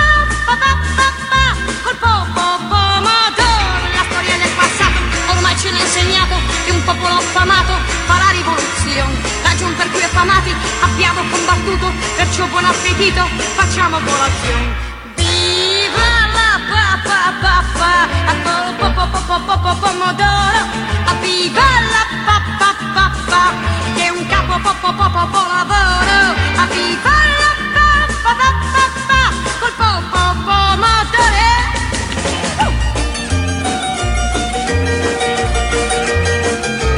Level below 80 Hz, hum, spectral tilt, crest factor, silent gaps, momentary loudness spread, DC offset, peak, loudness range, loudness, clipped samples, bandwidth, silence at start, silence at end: -22 dBFS; none; -3 dB/octave; 14 dB; none; 6 LU; under 0.1%; 0 dBFS; 2 LU; -13 LUFS; under 0.1%; 11 kHz; 0 s; 0 s